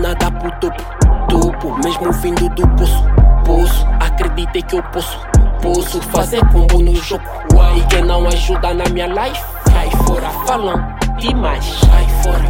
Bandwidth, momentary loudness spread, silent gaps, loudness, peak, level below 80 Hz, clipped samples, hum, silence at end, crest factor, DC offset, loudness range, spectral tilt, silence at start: 17 kHz; 7 LU; none; -15 LUFS; 0 dBFS; -14 dBFS; under 0.1%; none; 0 s; 12 dB; under 0.1%; 2 LU; -5.5 dB/octave; 0 s